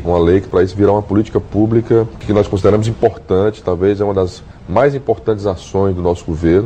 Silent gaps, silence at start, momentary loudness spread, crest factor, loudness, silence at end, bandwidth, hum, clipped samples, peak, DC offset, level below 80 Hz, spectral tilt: none; 0 s; 5 LU; 14 dB; -15 LUFS; 0 s; 8.8 kHz; none; under 0.1%; 0 dBFS; 0.3%; -34 dBFS; -8 dB/octave